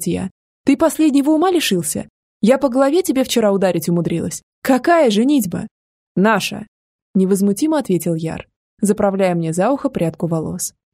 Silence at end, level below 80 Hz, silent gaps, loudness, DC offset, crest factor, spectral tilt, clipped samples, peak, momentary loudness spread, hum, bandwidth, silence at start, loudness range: 0.25 s; -52 dBFS; 0.31-0.64 s, 2.10-2.40 s, 4.43-4.62 s, 5.71-6.15 s, 6.68-7.14 s, 8.56-8.77 s; -17 LUFS; under 0.1%; 16 dB; -5.5 dB/octave; under 0.1%; 0 dBFS; 10 LU; none; 16 kHz; 0 s; 3 LU